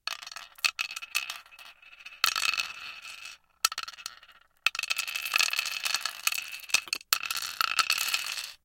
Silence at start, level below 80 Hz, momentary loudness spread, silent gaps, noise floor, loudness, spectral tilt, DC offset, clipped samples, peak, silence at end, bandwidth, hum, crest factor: 0.05 s; -72 dBFS; 17 LU; none; -57 dBFS; -28 LUFS; 3 dB/octave; under 0.1%; under 0.1%; -2 dBFS; 0.1 s; 17 kHz; none; 30 dB